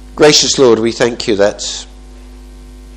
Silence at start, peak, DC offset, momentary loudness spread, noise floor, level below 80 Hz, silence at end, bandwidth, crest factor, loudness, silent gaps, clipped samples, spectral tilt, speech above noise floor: 0 s; 0 dBFS; under 0.1%; 13 LU; -33 dBFS; -36 dBFS; 0 s; 16 kHz; 14 dB; -11 LUFS; none; 0.3%; -3 dB/octave; 23 dB